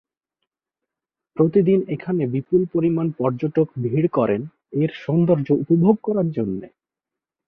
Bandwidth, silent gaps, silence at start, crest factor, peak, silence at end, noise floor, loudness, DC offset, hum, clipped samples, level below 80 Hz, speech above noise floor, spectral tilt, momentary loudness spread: 4.9 kHz; none; 1.35 s; 18 dB; -4 dBFS; 0.8 s; -87 dBFS; -20 LUFS; under 0.1%; none; under 0.1%; -60 dBFS; 68 dB; -11.5 dB/octave; 8 LU